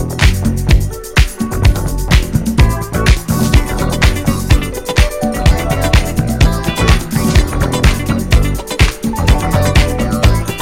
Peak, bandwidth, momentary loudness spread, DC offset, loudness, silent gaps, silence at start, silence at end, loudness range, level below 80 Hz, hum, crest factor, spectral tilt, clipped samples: 0 dBFS; 16.5 kHz; 3 LU; under 0.1%; -14 LUFS; none; 0 s; 0 s; 1 LU; -14 dBFS; none; 12 dB; -5 dB/octave; 0.2%